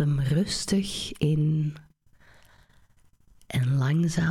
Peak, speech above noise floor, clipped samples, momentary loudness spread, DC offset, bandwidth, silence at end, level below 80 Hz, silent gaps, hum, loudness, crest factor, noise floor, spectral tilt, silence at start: -12 dBFS; 34 dB; under 0.1%; 8 LU; under 0.1%; 13.5 kHz; 0 s; -50 dBFS; none; none; -26 LUFS; 16 dB; -59 dBFS; -6 dB/octave; 0 s